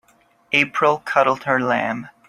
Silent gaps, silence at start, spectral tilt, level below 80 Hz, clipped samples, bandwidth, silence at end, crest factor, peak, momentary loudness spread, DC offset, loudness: none; 0.5 s; -5 dB/octave; -62 dBFS; under 0.1%; 13.5 kHz; 0.2 s; 20 dB; -2 dBFS; 4 LU; under 0.1%; -19 LUFS